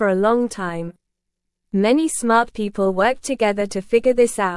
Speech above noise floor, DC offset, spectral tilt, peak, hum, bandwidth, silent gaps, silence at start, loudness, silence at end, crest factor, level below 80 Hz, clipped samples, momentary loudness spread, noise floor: 60 dB; under 0.1%; -5 dB/octave; -4 dBFS; none; 12 kHz; none; 0 s; -19 LUFS; 0 s; 16 dB; -50 dBFS; under 0.1%; 9 LU; -78 dBFS